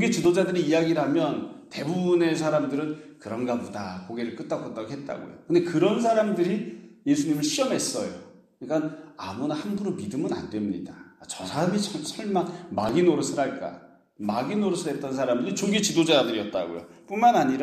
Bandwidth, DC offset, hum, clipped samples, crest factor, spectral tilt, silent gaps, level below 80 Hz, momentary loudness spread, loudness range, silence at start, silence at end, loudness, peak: 14.5 kHz; under 0.1%; none; under 0.1%; 18 dB; -5 dB/octave; none; -66 dBFS; 14 LU; 5 LU; 0 s; 0 s; -26 LUFS; -6 dBFS